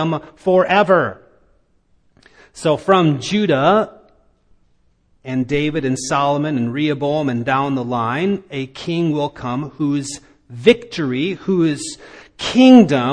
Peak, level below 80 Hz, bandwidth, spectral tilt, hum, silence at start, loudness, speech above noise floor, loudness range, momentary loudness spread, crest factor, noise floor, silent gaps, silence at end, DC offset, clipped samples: 0 dBFS; -52 dBFS; 10.5 kHz; -6 dB/octave; none; 0 s; -17 LUFS; 42 dB; 3 LU; 12 LU; 18 dB; -58 dBFS; none; 0 s; under 0.1%; under 0.1%